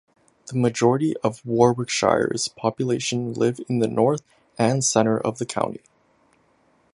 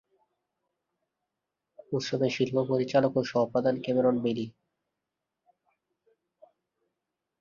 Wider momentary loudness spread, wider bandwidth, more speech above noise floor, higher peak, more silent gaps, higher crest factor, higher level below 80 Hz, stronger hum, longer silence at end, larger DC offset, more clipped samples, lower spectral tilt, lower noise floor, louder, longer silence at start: about the same, 7 LU vs 8 LU; first, 11.5 kHz vs 7.4 kHz; second, 40 dB vs 59 dB; first, -2 dBFS vs -12 dBFS; neither; about the same, 22 dB vs 20 dB; first, -60 dBFS vs -70 dBFS; neither; second, 1.2 s vs 2.9 s; neither; neither; second, -5 dB/octave vs -6.5 dB/octave; second, -62 dBFS vs -86 dBFS; first, -22 LUFS vs -28 LUFS; second, 0.45 s vs 1.9 s